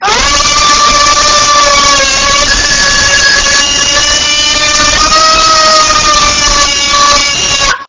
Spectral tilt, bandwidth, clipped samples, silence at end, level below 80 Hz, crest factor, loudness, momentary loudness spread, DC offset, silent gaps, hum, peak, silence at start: 0 dB/octave; 8 kHz; 0.4%; 0.05 s; -24 dBFS; 6 dB; -5 LUFS; 2 LU; under 0.1%; none; none; 0 dBFS; 0 s